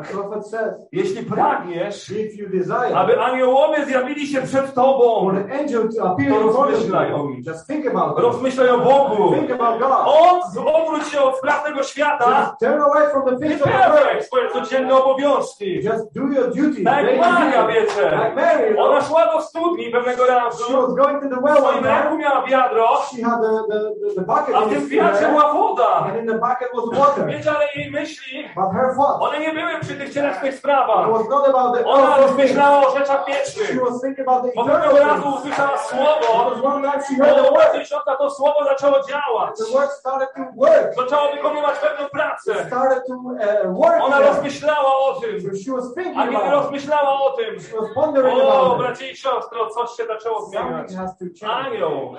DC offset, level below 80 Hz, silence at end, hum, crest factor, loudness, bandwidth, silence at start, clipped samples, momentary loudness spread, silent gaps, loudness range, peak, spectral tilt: under 0.1%; -64 dBFS; 0 s; none; 14 dB; -18 LUFS; 11 kHz; 0 s; under 0.1%; 10 LU; none; 4 LU; -2 dBFS; -5.5 dB/octave